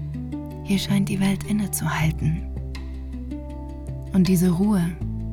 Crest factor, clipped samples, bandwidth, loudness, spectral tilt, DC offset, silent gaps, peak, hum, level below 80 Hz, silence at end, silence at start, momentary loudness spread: 14 dB; under 0.1%; 17.5 kHz; -24 LUFS; -6 dB/octave; under 0.1%; none; -10 dBFS; none; -34 dBFS; 0 s; 0 s; 15 LU